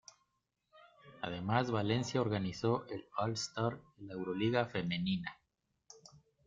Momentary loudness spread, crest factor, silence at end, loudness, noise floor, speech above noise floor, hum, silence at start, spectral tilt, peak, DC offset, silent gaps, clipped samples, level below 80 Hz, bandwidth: 14 LU; 22 dB; 0.3 s; -36 LUFS; -83 dBFS; 47 dB; none; 0.75 s; -5.5 dB/octave; -16 dBFS; under 0.1%; none; under 0.1%; -68 dBFS; 9 kHz